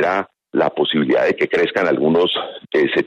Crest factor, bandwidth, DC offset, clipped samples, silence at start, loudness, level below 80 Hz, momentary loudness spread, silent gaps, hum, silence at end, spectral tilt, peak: 14 dB; 7.6 kHz; under 0.1%; under 0.1%; 0 s; -18 LUFS; -60 dBFS; 6 LU; none; none; 0 s; -6 dB/octave; -4 dBFS